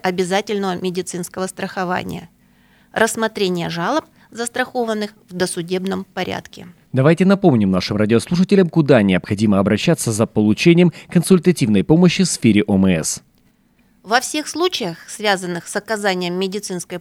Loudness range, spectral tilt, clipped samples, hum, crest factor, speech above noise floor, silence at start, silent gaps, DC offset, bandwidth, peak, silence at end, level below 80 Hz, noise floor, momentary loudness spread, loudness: 7 LU; -5.5 dB/octave; under 0.1%; none; 16 dB; 40 dB; 0.05 s; none; under 0.1%; 15.5 kHz; 0 dBFS; 0 s; -52 dBFS; -57 dBFS; 11 LU; -17 LUFS